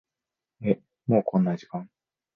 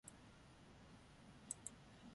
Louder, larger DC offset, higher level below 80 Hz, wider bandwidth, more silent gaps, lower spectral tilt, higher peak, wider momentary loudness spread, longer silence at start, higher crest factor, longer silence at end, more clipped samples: first, -26 LUFS vs -57 LUFS; neither; first, -64 dBFS vs -74 dBFS; second, 6.4 kHz vs 11.5 kHz; neither; first, -10 dB/octave vs -3 dB/octave; first, -8 dBFS vs -28 dBFS; about the same, 13 LU vs 13 LU; first, 0.6 s vs 0.05 s; second, 20 dB vs 32 dB; first, 0.5 s vs 0 s; neither